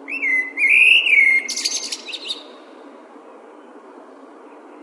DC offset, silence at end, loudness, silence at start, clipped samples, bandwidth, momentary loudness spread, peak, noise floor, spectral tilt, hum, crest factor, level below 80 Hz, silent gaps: under 0.1%; 0.05 s; -14 LUFS; 0 s; under 0.1%; 11.5 kHz; 18 LU; -4 dBFS; -42 dBFS; 3.5 dB/octave; none; 18 dB; under -90 dBFS; none